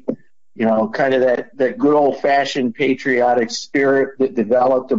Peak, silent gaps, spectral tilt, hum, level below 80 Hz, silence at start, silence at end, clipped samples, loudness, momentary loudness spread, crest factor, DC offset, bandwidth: -6 dBFS; none; -5 dB/octave; none; -64 dBFS; 0.1 s; 0 s; under 0.1%; -17 LUFS; 5 LU; 10 dB; 0.6%; 7.8 kHz